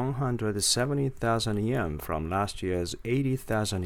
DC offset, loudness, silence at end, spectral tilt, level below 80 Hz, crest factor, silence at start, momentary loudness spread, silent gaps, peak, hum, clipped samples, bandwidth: under 0.1%; -28 LUFS; 0 s; -4.5 dB/octave; -46 dBFS; 16 dB; 0 s; 6 LU; none; -12 dBFS; none; under 0.1%; 18 kHz